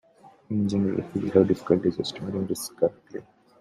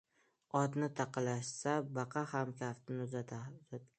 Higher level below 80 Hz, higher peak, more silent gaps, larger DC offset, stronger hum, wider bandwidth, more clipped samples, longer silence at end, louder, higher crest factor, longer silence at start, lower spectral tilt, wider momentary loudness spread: first, -62 dBFS vs -80 dBFS; first, -4 dBFS vs -18 dBFS; neither; neither; neither; first, 15 kHz vs 9 kHz; neither; first, 0.4 s vs 0.15 s; first, -26 LUFS vs -40 LUFS; about the same, 22 dB vs 20 dB; second, 0.25 s vs 0.55 s; about the same, -6.5 dB/octave vs -6 dB/octave; about the same, 11 LU vs 10 LU